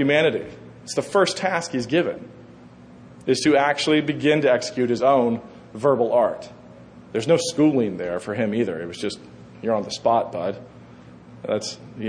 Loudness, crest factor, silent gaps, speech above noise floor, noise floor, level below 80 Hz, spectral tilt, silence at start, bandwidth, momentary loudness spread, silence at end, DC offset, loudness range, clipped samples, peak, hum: -22 LUFS; 16 dB; none; 24 dB; -45 dBFS; -62 dBFS; -5 dB/octave; 0 s; 10.5 kHz; 14 LU; 0 s; under 0.1%; 6 LU; under 0.1%; -6 dBFS; none